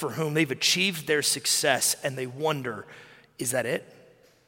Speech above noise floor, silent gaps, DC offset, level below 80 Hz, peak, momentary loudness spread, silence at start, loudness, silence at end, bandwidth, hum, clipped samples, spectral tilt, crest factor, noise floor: 30 dB; none; under 0.1%; -72 dBFS; -6 dBFS; 10 LU; 0 s; -25 LUFS; 0.65 s; 17 kHz; none; under 0.1%; -2.5 dB/octave; 22 dB; -57 dBFS